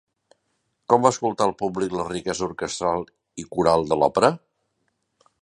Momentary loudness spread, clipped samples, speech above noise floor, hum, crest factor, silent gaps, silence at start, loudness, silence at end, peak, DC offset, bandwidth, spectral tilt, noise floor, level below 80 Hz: 14 LU; under 0.1%; 51 dB; none; 22 dB; none; 0.9 s; -22 LUFS; 1.05 s; -2 dBFS; under 0.1%; 11 kHz; -5 dB/octave; -73 dBFS; -54 dBFS